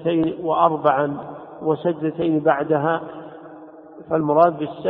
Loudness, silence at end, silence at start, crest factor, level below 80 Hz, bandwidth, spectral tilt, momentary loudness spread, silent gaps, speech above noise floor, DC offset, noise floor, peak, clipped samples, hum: -20 LUFS; 0 s; 0 s; 20 dB; -60 dBFS; 4.1 kHz; -12 dB/octave; 19 LU; none; 22 dB; under 0.1%; -41 dBFS; -2 dBFS; under 0.1%; none